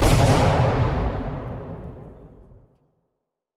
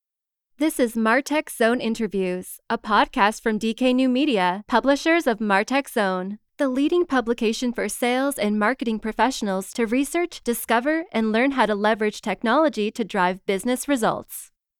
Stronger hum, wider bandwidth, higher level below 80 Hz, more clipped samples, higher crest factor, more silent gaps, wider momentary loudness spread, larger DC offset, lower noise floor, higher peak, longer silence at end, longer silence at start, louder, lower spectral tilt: neither; second, 15 kHz vs 18 kHz; first, -30 dBFS vs -54 dBFS; neither; about the same, 18 dB vs 18 dB; neither; first, 21 LU vs 6 LU; neither; second, -79 dBFS vs -87 dBFS; about the same, -4 dBFS vs -4 dBFS; first, 1.3 s vs 0.35 s; second, 0 s vs 0.6 s; about the same, -21 LUFS vs -22 LUFS; first, -6 dB/octave vs -4.5 dB/octave